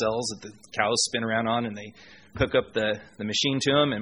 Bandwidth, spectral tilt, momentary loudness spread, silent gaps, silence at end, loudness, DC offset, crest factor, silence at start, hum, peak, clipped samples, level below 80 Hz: 11 kHz; -3.5 dB/octave; 15 LU; none; 0 s; -26 LUFS; under 0.1%; 20 dB; 0 s; none; -6 dBFS; under 0.1%; -50 dBFS